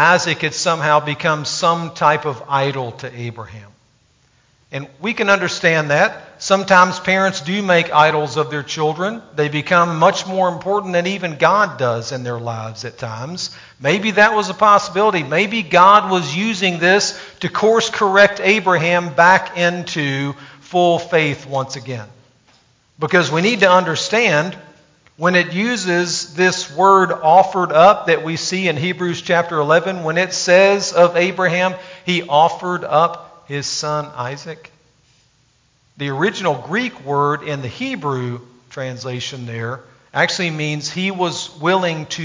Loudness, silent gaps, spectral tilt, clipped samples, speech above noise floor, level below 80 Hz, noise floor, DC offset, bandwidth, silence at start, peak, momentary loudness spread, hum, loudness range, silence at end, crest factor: -16 LUFS; none; -4 dB/octave; under 0.1%; 42 dB; -60 dBFS; -58 dBFS; under 0.1%; 7.6 kHz; 0 s; 0 dBFS; 15 LU; none; 8 LU; 0 s; 16 dB